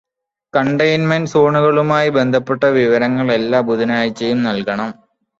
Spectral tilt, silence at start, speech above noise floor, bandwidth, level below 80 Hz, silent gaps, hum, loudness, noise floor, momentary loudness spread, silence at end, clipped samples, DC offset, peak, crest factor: -6.5 dB/octave; 0.55 s; 34 dB; 7.8 kHz; -56 dBFS; none; none; -15 LUFS; -49 dBFS; 6 LU; 0.45 s; under 0.1%; under 0.1%; -2 dBFS; 14 dB